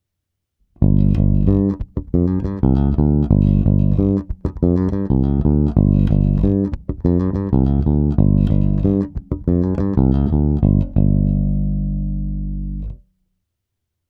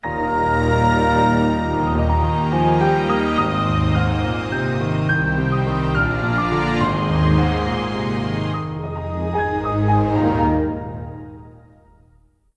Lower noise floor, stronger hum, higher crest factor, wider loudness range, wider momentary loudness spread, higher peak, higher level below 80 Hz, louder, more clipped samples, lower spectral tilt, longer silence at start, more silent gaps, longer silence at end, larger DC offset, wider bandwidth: first, -78 dBFS vs -55 dBFS; neither; about the same, 16 dB vs 14 dB; about the same, 2 LU vs 4 LU; about the same, 9 LU vs 8 LU; first, 0 dBFS vs -4 dBFS; first, -22 dBFS vs -30 dBFS; about the same, -17 LUFS vs -19 LUFS; neither; first, -12.5 dB/octave vs -7.5 dB/octave; first, 0.8 s vs 0 s; neither; first, 1.15 s vs 1 s; neither; second, 4.1 kHz vs 10 kHz